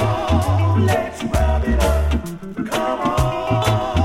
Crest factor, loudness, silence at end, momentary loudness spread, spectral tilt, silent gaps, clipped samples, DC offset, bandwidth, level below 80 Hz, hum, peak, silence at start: 14 dB; -19 LUFS; 0 s; 6 LU; -6.5 dB/octave; none; under 0.1%; under 0.1%; 15.5 kHz; -24 dBFS; none; -4 dBFS; 0 s